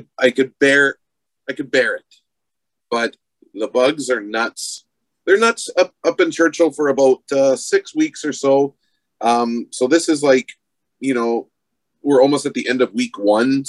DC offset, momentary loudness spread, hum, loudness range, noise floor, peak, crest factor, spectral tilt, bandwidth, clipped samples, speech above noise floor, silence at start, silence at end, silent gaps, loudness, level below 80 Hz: under 0.1%; 12 LU; none; 5 LU; -83 dBFS; 0 dBFS; 18 dB; -3.5 dB/octave; 12 kHz; under 0.1%; 66 dB; 0.2 s; 0 s; none; -17 LUFS; -70 dBFS